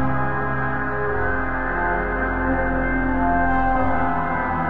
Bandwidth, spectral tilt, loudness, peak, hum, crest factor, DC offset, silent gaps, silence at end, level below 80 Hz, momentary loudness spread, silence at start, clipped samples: 4.7 kHz; -10 dB/octave; -22 LUFS; -8 dBFS; none; 12 dB; under 0.1%; none; 0 s; -30 dBFS; 4 LU; 0 s; under 0.1%